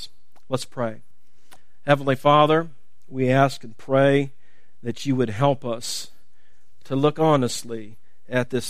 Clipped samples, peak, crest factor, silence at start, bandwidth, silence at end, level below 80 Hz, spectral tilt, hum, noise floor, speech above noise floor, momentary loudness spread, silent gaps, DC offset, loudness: under 0.1%; 0 dBFS; 22 dB; 0 s; 15.5 kHz; 0 s; -62 dBFS; -5.5 dB/octave; none; -65 dBFS; 44 dB; 17 LU; none; 2%; -22 LUFS